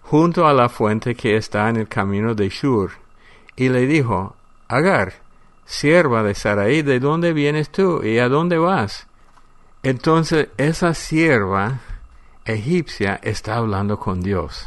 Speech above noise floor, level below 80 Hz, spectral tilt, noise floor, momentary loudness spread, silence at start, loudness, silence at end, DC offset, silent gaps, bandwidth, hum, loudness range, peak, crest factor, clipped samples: 29 dB; -42 dBFS; -6.5 dB/octave; -47 dBFS; 9 LU; 0.05 s; -18 LUFS; 0 s; under 0.1%; none; 11.5 kHz; none; 3 LU; -2 dBFS; 16 dB; under 0.1%